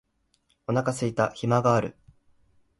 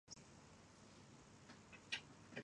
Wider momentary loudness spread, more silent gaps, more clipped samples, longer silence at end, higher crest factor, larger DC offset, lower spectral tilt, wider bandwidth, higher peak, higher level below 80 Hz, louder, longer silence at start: second, 11 LU vs 15 LU; neither; neither; first, 0.9 s vs 0 s; second, 20 dB vs 26 dB; neither; first, -6.5 dB/octave vs -2.5 dB/octave; about the same, 11.5 kHz vs 10.5 kHz; first, -8 dBFS vs -32 dBFS; first, -60 dBFS vs -78 dBFS; first, -25 LUFS vs -56 LUFS; first, 0.7 s vs 0.05 s